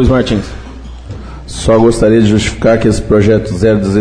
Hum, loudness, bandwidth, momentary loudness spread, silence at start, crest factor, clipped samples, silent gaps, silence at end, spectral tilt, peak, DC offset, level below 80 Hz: none; -10 LUFS; 10.5 kHz; 20 LU; 0 s; 10 dB; under 0.1%; none; 0 s; -6.5 dB/octave; 0 dBFS; 0.6%; -24 dBFS